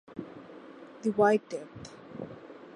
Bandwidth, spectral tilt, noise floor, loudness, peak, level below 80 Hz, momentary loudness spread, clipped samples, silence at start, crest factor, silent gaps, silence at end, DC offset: 11 kHz; -6.5 dB/octave; -49 dBFS; -28 LUFS; -12 dBFS; -70 dBFS; 23 LU; under 0.1%; 0.1 s; 20 dB; none; 0.05 s; under 0.1%